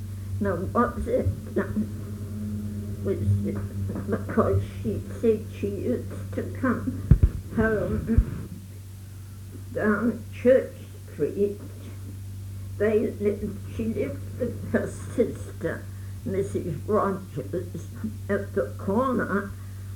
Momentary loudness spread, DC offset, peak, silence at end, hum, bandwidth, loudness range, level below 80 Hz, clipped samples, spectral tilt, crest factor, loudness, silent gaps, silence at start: 14 LU; under 0.1%; -4 dBFS; 0 s; none; 18.5 kHz; 3 LU; -38 dBFS; under 0.1%; -8 dB/octave; 24 dB; -27 LUFS; none; 0 s